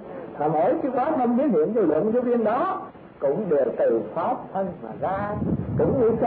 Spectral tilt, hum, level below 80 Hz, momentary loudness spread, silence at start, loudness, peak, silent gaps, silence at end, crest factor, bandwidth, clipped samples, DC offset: -12.5 dB/octave; none; -50 dBFS; 8 LU; 0 s; -24 LUFS; -12 dBFS; none; 0 s; 12 dB; 4.3 kHz; under 0.1%; under 0.1%